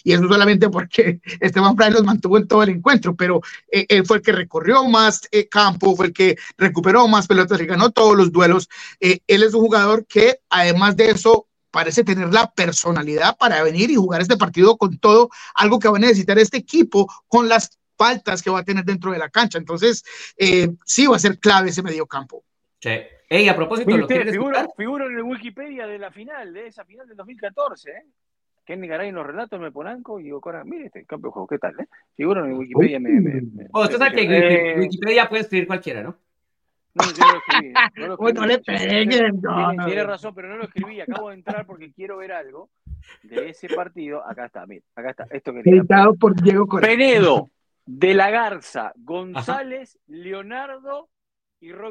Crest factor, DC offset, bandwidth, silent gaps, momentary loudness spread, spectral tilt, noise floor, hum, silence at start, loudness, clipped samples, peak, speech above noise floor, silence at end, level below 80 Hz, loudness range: 16 dB; under 0.1%; 9.4 kHz; none; 19 LU; -4.5 dB/octave; -78 dBFS; none; 0.05 s; -16 LUFS; under 0.1%; 0 dBFS; 61 dB; 0 s; -56 dBFS; 17 LU